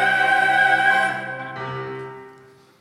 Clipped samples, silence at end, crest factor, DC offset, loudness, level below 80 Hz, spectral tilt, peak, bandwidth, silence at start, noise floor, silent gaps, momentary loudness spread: under 0.1%; 0.5 s; 16 dB; under 0.1%; -18 LUFS; -70 dBFS; -3.5 dB/octave; -6 dBFS; 15 kHz; 0 s; -49 dBFS; none; 17 LU